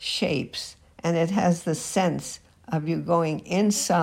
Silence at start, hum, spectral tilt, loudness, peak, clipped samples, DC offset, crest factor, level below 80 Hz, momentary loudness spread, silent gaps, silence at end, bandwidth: 0 s; none; -5 dB/octave; -25 LUFS; -10 dBFS; under 0.1%; under 0.1%; 16 dB; -60 dBFS; 11 LU; none; 0 s; 16 kHz